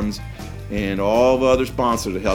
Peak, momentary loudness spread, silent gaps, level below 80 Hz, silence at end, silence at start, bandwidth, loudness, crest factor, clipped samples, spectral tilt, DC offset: -4 dBFS; 16 LU; none; -36 dBFS; 0 s; 0 s; 18 kHz; -19 LUFS; 16 dB; under 0.1%; -5.5 dB/octave; under 0.1%